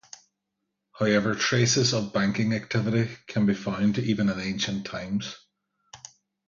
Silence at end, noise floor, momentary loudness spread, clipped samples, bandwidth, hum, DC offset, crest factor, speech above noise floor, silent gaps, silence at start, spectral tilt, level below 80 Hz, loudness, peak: 0.5 s; -82 dBFS; 11 LU; under 0.1%; 7.4 kHz; none; under 0.1%; 18 dB; 56 dB; none; 0.95 s; -4.5 dB/octave; -58 dBFS; -25 LUFS; -8 dBFS